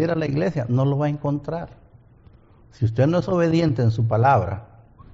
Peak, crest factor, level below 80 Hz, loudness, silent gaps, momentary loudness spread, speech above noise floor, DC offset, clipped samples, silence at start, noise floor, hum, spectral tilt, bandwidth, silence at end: -6 dBFS; 16 dB; -50 dBFS; -21 LUFS; none; 12 LU; 30 dB; under 0.1%; under 0.1%; 0 s; -51 dBFS; none; -7.5 dB/octave; 7.4 kHz; 0.5 s